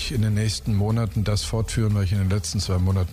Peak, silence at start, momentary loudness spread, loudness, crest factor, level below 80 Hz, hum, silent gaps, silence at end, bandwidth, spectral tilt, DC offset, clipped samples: -12 dBFS; 0 s; 2 LU; -23 LUFS; 10 dB; -36 dBFS; none; none; 0 s; 15 kHz; -5.5 dB/octave; under 0.1%; under 0.1%